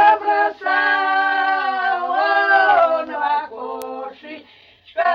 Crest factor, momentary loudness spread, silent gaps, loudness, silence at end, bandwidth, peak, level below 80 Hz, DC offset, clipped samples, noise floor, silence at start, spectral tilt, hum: 14 dB; 17 LU; none; -17 LUFS; 0 s; 16 kHz; -4 dBFS; -66 dBFS; under 0.1%; under 0.1%; -48 dBFS; 0 s; -3 dB/octave; none